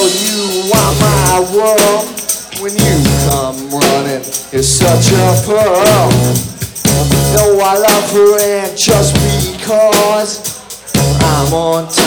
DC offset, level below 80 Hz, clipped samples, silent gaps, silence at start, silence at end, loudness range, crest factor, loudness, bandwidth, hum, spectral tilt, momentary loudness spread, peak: under 0.1%; -28 dBFS; under 0.1%; none; 0 s; 0 s; 2 LU; 10 dB; -11 LUFS; over 20 kHz; none; -4 dB/octave; 8 LU; 0 dBFS